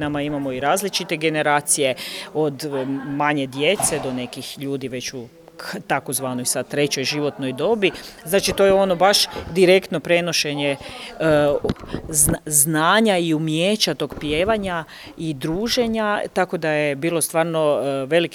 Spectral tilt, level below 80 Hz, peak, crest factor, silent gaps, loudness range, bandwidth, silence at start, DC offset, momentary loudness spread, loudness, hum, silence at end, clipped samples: -3.5 dB/octave; -46 dBFS; 0 dBFS; 20 dB; none; 6 LU; over 20 kHz; 0 s; under 0.1%; 12 LU; -20 LUFS; none; 0 s; under 0.1%